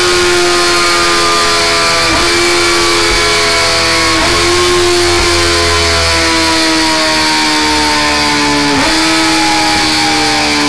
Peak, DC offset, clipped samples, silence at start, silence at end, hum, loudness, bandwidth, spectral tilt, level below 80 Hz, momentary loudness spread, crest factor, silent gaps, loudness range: -6 dBFS; 4%; under 0.1%; 0 s; 0 s; none; -8 LUFS; 11 kHz; -2 dB/octave; -28 dBFS; 1 LU; 4 dB; none; 1 LU